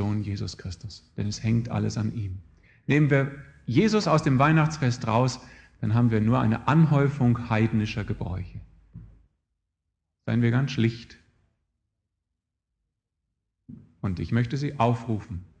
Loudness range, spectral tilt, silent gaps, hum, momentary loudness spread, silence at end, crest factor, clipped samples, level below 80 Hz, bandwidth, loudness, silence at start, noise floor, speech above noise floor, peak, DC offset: 8 LU; -7 dB/octave; none; none; 17 LU; 0.15 s; 20 dB; under 0.1%; -50 dBFS; 8.6 kHz; -25 LUFS; 0 s; -83 dBFS; 59 dB; -6 dBFS; under 0.1%